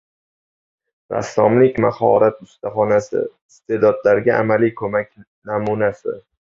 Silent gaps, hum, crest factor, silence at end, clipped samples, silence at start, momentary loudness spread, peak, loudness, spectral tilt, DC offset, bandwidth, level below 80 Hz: 3.42-3.49 s, 5.27-5.42 s; none; 16 dB; 0.4 s; under 0.1%; 1.1 s; 14 LU; -2 dBFS; -17 LUFS; -7.5 dB/octave; under 0.1%; 7.6 kHz; -56 dBFS